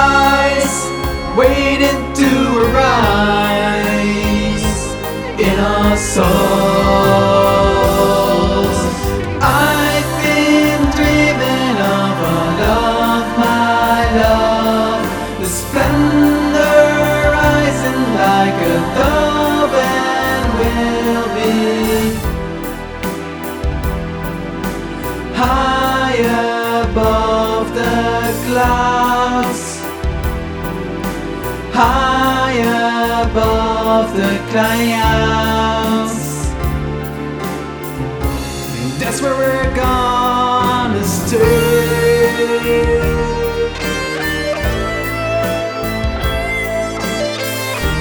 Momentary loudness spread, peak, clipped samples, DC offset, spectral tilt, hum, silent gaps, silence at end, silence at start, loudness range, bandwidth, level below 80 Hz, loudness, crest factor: 10 LU; 0 dBFS; under 0.1%; under 0.1%; -5 dB/octave; none; none; 0 s; 0 s; 5 LU; over 20 kHz; -26 dBFS; -14 LUFS; 14 dB